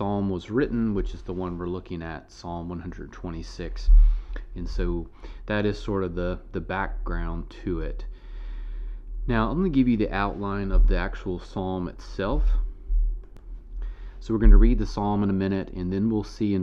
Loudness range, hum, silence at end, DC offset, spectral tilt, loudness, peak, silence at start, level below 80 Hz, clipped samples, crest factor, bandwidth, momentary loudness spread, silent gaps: 6 LU; none; 0 s; under 0.1%; -8 dB/octave; -27 LUFS; -4 dBFS; 0 s; -26 dBFS; under 0.1%; 20 dB; 6.6 kHz; 17 LU; none